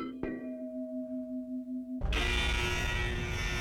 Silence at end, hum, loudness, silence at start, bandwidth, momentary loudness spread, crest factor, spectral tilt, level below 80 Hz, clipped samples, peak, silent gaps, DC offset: 0 s; none; -34 LUFS; 0 s; 16.5 kHz; 9 LU; 16 dB; -4.5 dB/octave; -38 dBFS; under 0.1%; -18 dBFS; none; under 0.1%